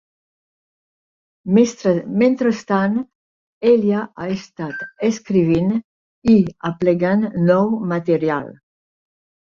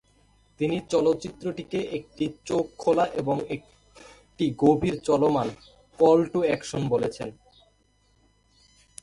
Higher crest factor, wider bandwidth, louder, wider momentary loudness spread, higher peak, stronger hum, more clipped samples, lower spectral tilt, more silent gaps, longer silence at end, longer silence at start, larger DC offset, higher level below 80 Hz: about the same, 16 dB vs 20 dB; second, 7.4 kHz vs 11.5 kHz; first, -18 LUFS vs -25 LUFS; about the same, 11 LU vs 12 LU; first, -2 dBFS vs -8 dBFS; neither; neither; about the same, -7.5 dB/octave vs -6.5 dB/octave; first, 3.15-3.61 s, 5.84-6.22 s vs none; second, 0.95 s vs 1.7 s; first, 1.45 s vs 0.6 s; neither; about the same, -54 dBFS vs -56 dBFS